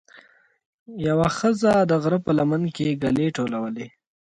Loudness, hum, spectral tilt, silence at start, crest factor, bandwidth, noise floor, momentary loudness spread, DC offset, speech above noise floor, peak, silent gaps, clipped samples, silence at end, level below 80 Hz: -22 LUFS; none; -7 dB/octave; 0.9 s; 16 dB; 11 kHz; -54 dBFS; 12 LU; under 0.1%; 33 dB; -6 dBFS; none; under 0.1%; 0.35 s; -54 dBFS